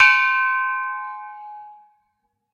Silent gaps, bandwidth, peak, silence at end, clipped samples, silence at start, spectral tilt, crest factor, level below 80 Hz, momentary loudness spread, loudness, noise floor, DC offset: none; 9.2 kHz; 0 dBFS; 0.8 s; under 0.1%; 0 s; 3.5 dB/octave; 20 dB; -72 dBFS; 23 LU; -19 LUFS; -73 dBFS; under 0.1%